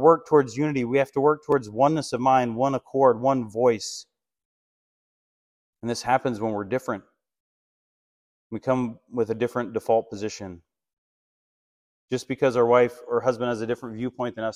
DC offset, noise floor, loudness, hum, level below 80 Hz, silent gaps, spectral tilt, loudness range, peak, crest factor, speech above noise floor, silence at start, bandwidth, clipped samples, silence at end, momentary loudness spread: under 0.1%; under -90 dBFS; -24 LUFS; none; -64 dBFS; 4.45-5.73 s, 7.40-8.50 s, 10.93-12.08 s; -6 dB/octave; 8 LU; -4 dBFS; 22 dB; over 67 dB; 0 s; 13 kHz; under 0.1%; 0.05 s; 13 LU